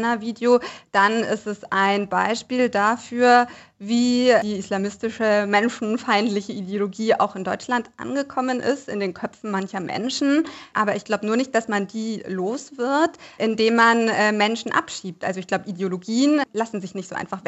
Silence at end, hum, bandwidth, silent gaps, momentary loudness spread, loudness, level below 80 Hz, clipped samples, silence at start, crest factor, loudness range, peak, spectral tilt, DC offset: 0.1 s; none; 8.2 kHz; none; 10 LU; -22 LUFS; -68 dBFS; under 0.1%; 0 s; 18 dB; 5 LU; -4 dBFS; -4.5 dB/octave; under 0.1%